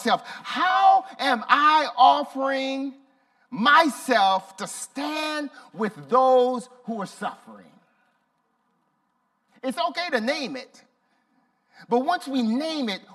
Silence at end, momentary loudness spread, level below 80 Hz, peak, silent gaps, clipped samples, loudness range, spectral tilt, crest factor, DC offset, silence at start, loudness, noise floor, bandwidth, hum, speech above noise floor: 0.15 s; 16 LU; -82 dBFS; -4 dBFS; none; under 0.1%; 11 LU; -3.5 dB/octave; 22 dB; under 0.1%; 0 s; -22 LUFS; -71 dBFS; 14 kHz; none; 49 dB